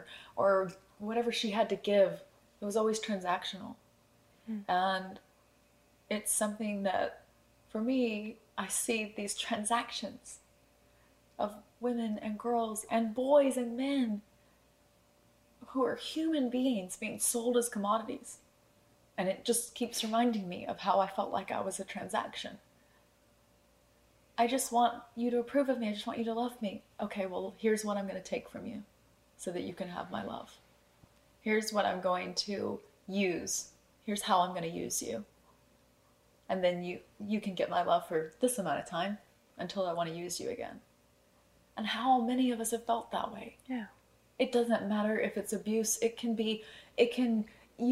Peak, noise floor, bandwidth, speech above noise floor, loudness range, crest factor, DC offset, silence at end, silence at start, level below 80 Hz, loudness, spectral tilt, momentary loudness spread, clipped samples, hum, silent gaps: -14 dBFS; -67 dBFS; 16 kHz; 34 dB; 5 LU; 20 dB; under 0.1%; 0 s; 0 s; -72 dBFS; -34 LUFS; -3.5 dB/octave; 13 LU; under 0.1%; none; none